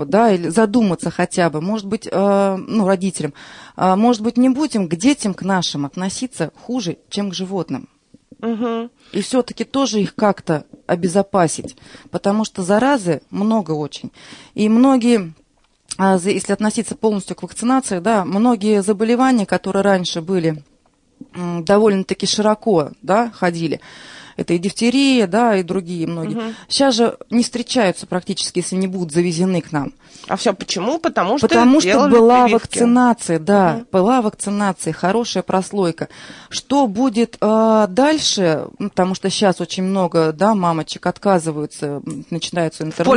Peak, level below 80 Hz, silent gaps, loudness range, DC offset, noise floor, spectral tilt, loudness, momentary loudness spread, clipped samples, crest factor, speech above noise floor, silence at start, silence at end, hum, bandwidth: -2 dBFS; -56 dBFS; none; 6 LU; under 0.1%; -57 dBFS; -5 dB/octave; -17 LUFS; 11 LU; under 0.1%; 14 dB; 40 dB; 0 s; 0 s; none; 11 kHz